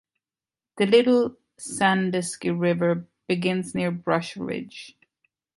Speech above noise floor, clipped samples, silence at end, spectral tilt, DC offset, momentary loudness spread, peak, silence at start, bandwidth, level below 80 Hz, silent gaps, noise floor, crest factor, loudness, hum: over 67 dB; under 0.1%; 0.7 s; -5.5 dB/octave; under 0.1%; 14 LU; -6 dBFS; 0.75 s; 11.5 kHz; -64 dBFS; none; under -90 dBFS; 18 dB; -24 LUFS; none